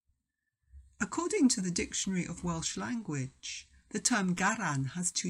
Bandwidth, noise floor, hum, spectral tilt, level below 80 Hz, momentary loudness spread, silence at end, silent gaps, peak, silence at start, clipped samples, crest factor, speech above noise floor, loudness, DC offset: 15 kHz; -85 dBFS; none; -3.5 dB/octave; -58 dBFS; 12 LU; 0 s; none; -12 dBFS; 0.75 s; under 0.1%; 22 dB; 53 dB; -32 LUFS; under 0.1%